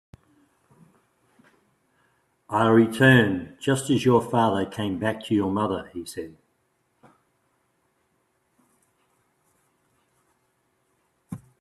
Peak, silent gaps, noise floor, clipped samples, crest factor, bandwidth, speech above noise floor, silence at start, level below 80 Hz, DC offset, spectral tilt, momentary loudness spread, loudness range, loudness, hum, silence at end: -2 dBFS; none; -71 dBFS; under 0.1%; 24 dB; 13.5 kHz; 49 dB; 2.5 s; -64 dBFS; under 0.1%; -6 dB/octave; 21 LU; 12 LU; -22 LUFS; none; 0.25 s